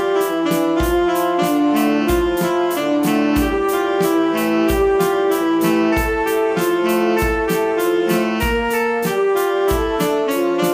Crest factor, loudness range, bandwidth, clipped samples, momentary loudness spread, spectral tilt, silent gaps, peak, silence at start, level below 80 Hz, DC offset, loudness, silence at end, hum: 14 dB; 1 LU; 16 kHz; under 0.1%; 2 LU; -5 dB/octave; none; -4 dBFS; 0 s; -32 dBFS; under 0.1%; -17 LUFS; 0 s; none